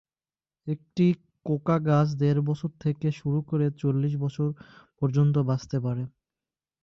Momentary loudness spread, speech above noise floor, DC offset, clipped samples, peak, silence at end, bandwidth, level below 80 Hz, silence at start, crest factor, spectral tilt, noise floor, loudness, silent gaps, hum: 10 LU; over 65 dB; under 0.1%; under 0.1%; -12 dBFS; 0.75 s; 7 kHz; -62 dBFS; 0.65 s; 14 dB; -9 dB/octave; under -90 dBFS; -27 LUFS; none; none